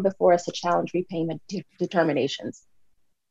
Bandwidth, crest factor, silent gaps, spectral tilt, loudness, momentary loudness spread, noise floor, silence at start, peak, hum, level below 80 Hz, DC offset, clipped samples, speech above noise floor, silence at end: 8 kHz; 18 dB; none; -5.5 dB/octave; -25 LUFS; 13 LU; -64 dBFS; 0 s; -8 dBFS; none; -72 dBFS; under 0.1%; under 0.1%; 40 dB; 0.75 s